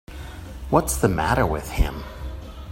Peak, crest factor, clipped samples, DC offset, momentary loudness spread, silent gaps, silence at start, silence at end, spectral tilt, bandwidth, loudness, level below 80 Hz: -2 dBFS; 22 dB; under 0.1%; under 0.1%; 17 LU; none; 0.1 s; 0 s; -5.5 dB/octave; 16.5 kHz; -22 LUFS; -30 dBFS